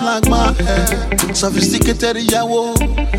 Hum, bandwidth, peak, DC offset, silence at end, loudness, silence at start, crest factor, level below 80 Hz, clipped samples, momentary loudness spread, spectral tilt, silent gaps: none; 17 kHz; 0 dBFS; under 0.1%; 0 s; -15 LUFS; 0 s; 14 dB; -20 dBFS; under 0.1%; 3 LU; -4 dB/octave; none